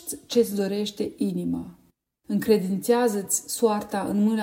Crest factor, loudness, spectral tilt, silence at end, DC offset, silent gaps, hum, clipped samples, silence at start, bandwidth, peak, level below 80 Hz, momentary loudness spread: 16 dB; -25 LUFS; -5 dB/octave; 0 s; under 0.1%; none; none; under 0.1%; 0.05 s; 16.5 kHz; -8 dBFS; -62 dBFS; 8 LU